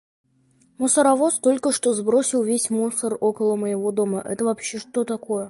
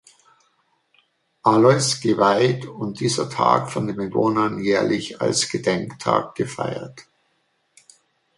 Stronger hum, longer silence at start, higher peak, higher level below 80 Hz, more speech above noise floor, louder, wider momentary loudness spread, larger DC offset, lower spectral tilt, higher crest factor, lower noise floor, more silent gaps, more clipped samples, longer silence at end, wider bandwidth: neither; second, 0.8 s vs 1.45 s; second, -6 dBFS vs -2 dBFS; second, -70 dBFS vs -60 dBFS; second, 39 dB vs 48 dB; about the same, -21 LUFS vs -20 LUFS; second, 8 LU vs 11 LU; neither; about the same, -4 dB/octave vs -4.5 dB/octave; about the same, 16 dB vs 20 dB; second, -60 dBFS vs -68 dBFS; neither; neither; second, 0 s vs 1.35 s; about the same, 11.5 kHz vs 11.5 kHz